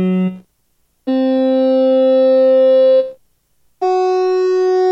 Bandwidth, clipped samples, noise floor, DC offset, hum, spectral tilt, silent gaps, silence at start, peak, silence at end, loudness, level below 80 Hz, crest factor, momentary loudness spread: 6.6 kHz; under 0.1%; -62 dBFS; under 0.1%; none; -8 dB/octave; none; 0 s; -6 dBFS; 0 s; -13 LUFS; -66 dBFS; 8 dB; 10 LU